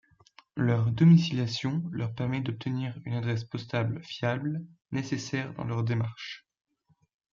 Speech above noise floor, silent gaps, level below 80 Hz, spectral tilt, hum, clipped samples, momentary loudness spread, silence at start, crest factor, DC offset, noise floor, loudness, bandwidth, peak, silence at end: 32 dB; none; -62 dBFS; -7 dB/octave; none; under 0.1%; 13 LU; 0.55 s; 18 dB; under 0.1%; -60 dBFS; -29 LUFS; 7.2 kHz; -10 dBFS; 0.95 s